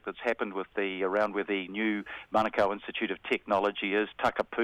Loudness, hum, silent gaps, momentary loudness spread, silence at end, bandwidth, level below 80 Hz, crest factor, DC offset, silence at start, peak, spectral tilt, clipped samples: -30 LUFS; none; none; 5 LU; 0 s; 13 kHz; -64 dBFS; 18 dB; under 0.1%; 0.05 s; -12 dBFS; -5.5 dB/octave; under 0.1%